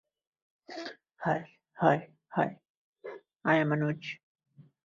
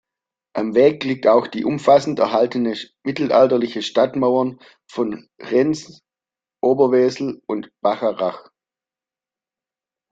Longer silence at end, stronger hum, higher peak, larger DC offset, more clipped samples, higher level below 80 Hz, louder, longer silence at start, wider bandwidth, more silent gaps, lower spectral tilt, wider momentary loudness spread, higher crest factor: second, 0.7 s vs 1.7 s; neither; second, -8 dBFS vs -2 dBFS; neither; neither; second, -74 dBFS vs -64 dBFS; second, -31 LUFS vs -19 LUFS; first, 0.7 s vs 0.55 s; about the same, 7.4 kHz vs 8 kHz; first, 2.70-2.93 s vs none; first, -7.5 dB/octave vs -6 dB/octave; first, 20 LU vs 12 LU; first, 24 dB vs 18 dB